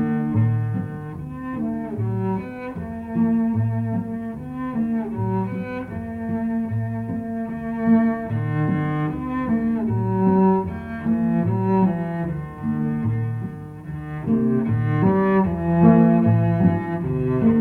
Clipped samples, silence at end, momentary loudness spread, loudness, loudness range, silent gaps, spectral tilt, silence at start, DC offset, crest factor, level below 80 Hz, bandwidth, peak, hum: under 0.1%; 0 s; 12 LU; -22 LUFS; 7 LU; none; -11 dB/octave; 0 s; under 0.1%; 18 dB; -46 dBFS; 4.2 kHz; -4 dBFS; none